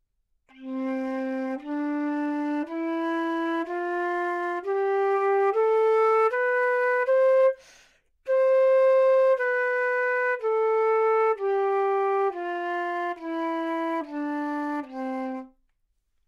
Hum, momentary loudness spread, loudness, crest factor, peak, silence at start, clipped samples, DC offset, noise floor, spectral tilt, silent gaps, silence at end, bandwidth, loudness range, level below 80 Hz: none; 11 LU; -25 LUFS; 12 dB; -12 dBFS; 0.6 s; under 0.1%; under 0.1%; -72 dBFS; -4 dB/octave; none; 0.8 s; 7.2 kHz; 7 LU; -72 dBFS